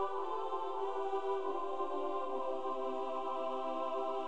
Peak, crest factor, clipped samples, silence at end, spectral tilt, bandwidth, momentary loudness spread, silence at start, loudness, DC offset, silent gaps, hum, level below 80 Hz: -24 dBFS; 12 dB; under 0.1%; 0 s; -5 dB/octave; 9 kHz; 1 LU; 0 s; -38 LUFS; 0.7%; none; none; -76 dBFS